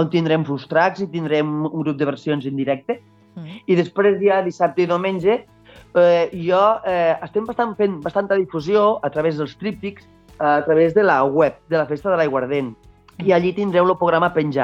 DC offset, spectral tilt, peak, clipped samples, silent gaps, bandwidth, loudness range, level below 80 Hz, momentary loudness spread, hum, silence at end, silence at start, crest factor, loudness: under 0.1%; -7.5 dB/octave; -4 dBFS; under 0.1%; none; 7.6 kHz; 3 LU; -56 dBFS; 9 LU; none; 0 s; 0 s; 16 dB; -19 LUFS